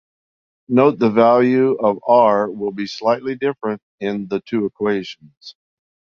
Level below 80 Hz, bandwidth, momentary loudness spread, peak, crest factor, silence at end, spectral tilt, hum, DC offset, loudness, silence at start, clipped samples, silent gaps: -64 dBFS; 6.8 kHz; 12 LU; -2 dBFS; 16 dB; 0.65 s; -7.5 dB/octave; none; under 0.1%; -18 LUFS; 0.7 s; under 0.1%; 3.82-3.98 s, 5.37-5.41 s